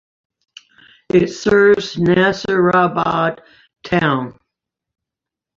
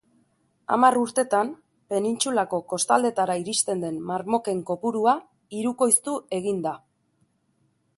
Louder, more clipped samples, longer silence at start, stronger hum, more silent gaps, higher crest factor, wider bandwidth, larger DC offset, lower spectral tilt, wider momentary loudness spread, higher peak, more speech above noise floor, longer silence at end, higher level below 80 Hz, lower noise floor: first, -15 LUFS vs -24 LUFS; neither; first, 1.15 s vs 0.7 s; neither; neither; second, 16 dB vs 22 dB; second, 7.6 kHz vs 12 kHz; neither; first, -6 dB/octave vs -3.5 dB/octave; about the same, 9 LU vs 10 LU; first, 0 dBFS vs -4 dBFS; first, 70 dB vs 45 dB; about the same, 1.25 s vs 1.2 s; first, -50 dBFS vs -70 dBFS; first, -85 dBFS vs -69 dBFS